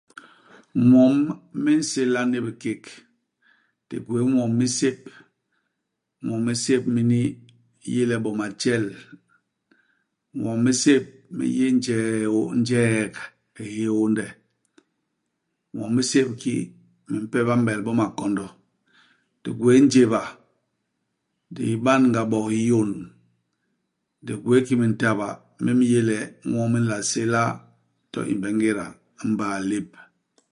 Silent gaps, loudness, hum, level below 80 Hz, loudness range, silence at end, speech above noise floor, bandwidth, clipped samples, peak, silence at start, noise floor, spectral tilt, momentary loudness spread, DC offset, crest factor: none; -22 LUFS; none; -62 dBFS; 5 LU; 0.5 s; 58 dB; 11 kHz; under 0.1%; -4 dBFS; 0.75 s; -80 dBFS; -5.5 dB/octave; 16 LU; under 0.1%; 20 dB